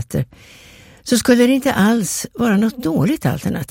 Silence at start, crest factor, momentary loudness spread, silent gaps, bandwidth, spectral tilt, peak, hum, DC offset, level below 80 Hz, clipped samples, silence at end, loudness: 0 s; 16 dB; 11 LU; none; 16.5 kHz; -5 dB/octave; -2 dBFS; none; under 0.1%; -46 dBFS; under 0.1%; 0.05 s; -17 LUFS